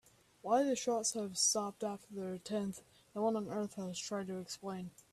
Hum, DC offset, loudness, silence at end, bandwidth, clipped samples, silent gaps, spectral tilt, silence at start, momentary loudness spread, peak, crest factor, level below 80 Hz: none; under 0.1%; -37 LUFS; 0.25 s; 14 kHz; under 0.1%; none; -3.5 dB/octave; 0.45 s; 12 LU; -20 dBFS; 18 dB; -76 dBFS